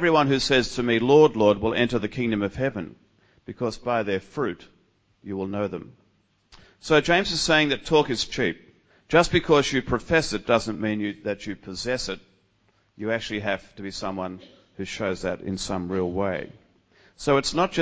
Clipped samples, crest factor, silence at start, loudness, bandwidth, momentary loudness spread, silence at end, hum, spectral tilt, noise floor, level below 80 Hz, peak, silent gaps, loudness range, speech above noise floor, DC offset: under 0.1%; 22 dB; 0 s; -24 LUFS; 8 kHz; 15 LU; 0 s; none; -4.5 dB/octave; -66 dBFS; -48 dBFS; -4 dBFS; none; 9 LU; 42 dB; under 0.1%